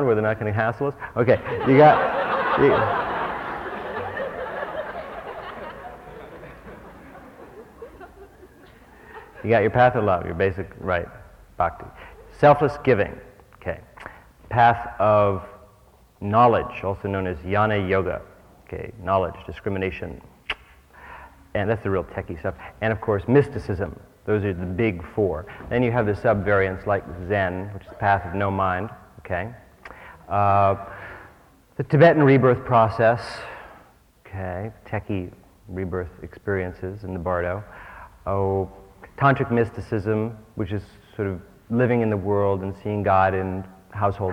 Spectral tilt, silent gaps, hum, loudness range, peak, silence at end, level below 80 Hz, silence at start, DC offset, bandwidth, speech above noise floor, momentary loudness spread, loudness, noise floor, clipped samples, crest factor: -8.5 dB/octave; none; none; 11 LU; -4 dBFS; 0 s; -48 dBFS; 0 s; under 0.1%; 11.5 kHz; 32 dB; 22 LU; -22 LUFS; -54 dBFS; under 0.1%; 20 dB